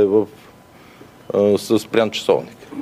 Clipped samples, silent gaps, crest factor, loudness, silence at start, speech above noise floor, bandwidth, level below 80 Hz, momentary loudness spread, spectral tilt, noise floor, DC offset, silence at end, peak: under 0.1%; none; 18 dB; -19 LUFS; 0 s; 27 dB; 15.5 kHz; -62 dBFS; 9 LU; -5.5 dB/octave; -45 dBFS; under 0.1%; 0 s; -2 dBFS